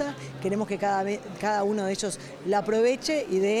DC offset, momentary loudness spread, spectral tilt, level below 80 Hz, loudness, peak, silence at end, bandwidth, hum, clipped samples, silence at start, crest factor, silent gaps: under 0.1%; 8 LU; -4.5 dB/octave; -62 dBFS; -27 LUFS; -12 dBFS; 0 s; 13.5 kHz; none; under 0.1%; 0 s; 14 dB; none